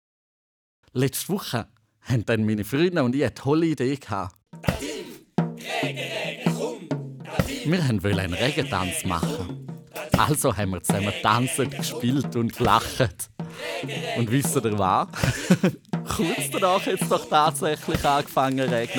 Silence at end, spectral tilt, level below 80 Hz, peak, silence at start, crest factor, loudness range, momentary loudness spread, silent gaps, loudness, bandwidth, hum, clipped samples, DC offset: 0 s; -5 dB/octave; -48 dBFS; -2 dBFS; 0.95 s; 22 dB; 4 LU; 10 LU; none; -24 LUFS; over 20 kHz; none; under 0.1%; under 0.1%